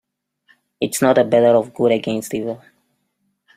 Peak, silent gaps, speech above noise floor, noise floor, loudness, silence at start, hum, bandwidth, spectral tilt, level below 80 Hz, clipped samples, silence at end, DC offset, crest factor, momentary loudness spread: -2 dBFS; none; 53 dB; -70 dBFS; -17 LUFS; 0.8 s; none; 16 kHz; -5 dB/octave; -62 dBFS; under 0.1%; 1 s; under 0.1%; 18 dB; 12 LU